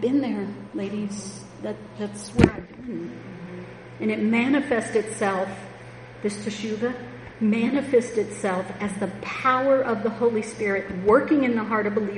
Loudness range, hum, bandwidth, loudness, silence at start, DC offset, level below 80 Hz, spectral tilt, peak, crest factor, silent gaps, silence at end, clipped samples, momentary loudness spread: 5 LU; none; 10.5 kHz; -24 LUFS; 0 s; under 0.1%; -48 dBFS; -6 dB/octave; -2 dBFS; 24 dB; none; 0 s; under 0.1%; 16 LU